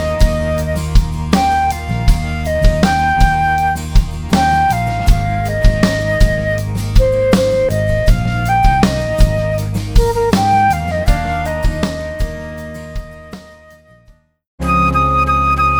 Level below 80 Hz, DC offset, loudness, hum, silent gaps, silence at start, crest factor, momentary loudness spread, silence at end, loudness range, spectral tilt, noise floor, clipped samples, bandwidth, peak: -18 dBFS; under 0.1%; -15 LUFS; none; 14.47-14.58 s; 0 s; 14 dB; 10 LU; 0 s; 6 LU; -6 dB/octave; -48 dBFS; under 0.1%; over 20 kHz; 0 dBFS